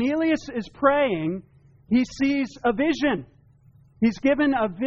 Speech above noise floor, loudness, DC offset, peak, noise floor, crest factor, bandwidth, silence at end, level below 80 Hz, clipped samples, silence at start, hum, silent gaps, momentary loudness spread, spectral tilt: 32 dB; -23 LUFS; under 0.1%; -6 dBFS; -55 dBFS; 18 dB; 7.8 kHz; 0 s; -52 dBFS; under 0.1%; 0 s; none; none; 8 LU; -4.5 dB/octave